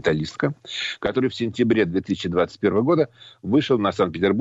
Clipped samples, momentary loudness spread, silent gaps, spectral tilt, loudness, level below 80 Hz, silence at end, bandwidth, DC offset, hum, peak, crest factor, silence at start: under 0.1%; 7 LU; none; -6.5 dB/octave; -22 LUFS; -52 dBFS; 0 s; 8 kHz; under 0.1%; none; -8 dBFS; 14 dB; 0.05 s